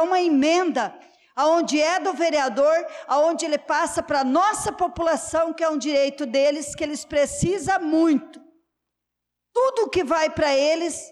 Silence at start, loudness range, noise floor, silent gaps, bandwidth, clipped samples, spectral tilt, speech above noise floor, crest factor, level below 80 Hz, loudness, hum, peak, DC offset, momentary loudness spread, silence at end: 0 s; 2 LU; -83 dBFS; none; 13 kHz; under 0.1%; -4 dB/octave; 61 dB; 10 dB; -52 dBFS; -22 LUFS; none; -12 dBFS; under 0.1%; 6 LU; 0 s